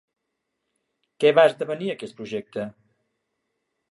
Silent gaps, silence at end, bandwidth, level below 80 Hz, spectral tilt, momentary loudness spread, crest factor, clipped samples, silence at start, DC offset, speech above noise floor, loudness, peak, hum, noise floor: none; 1.2 s; 11.5 kHz; -76 dBFS; -5.5 dB/octave; 17 LU; 22 dB; under 0.1%; 1.2 s; under 0.1%; 58 dB; -22 LUFS; -4 dBFS; none; -79 dBFS